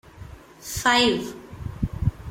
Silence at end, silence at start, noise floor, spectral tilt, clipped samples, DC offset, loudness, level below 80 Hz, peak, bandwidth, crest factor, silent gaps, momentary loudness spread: 0 s; 0.15 s; -43 dBFS; -4 dB/octave; under 0.1%; under 0.1%; -23 LUFS; -40 dBFS; -6 dBFS; 16.5 kHz; 20 dB; none; 26 LU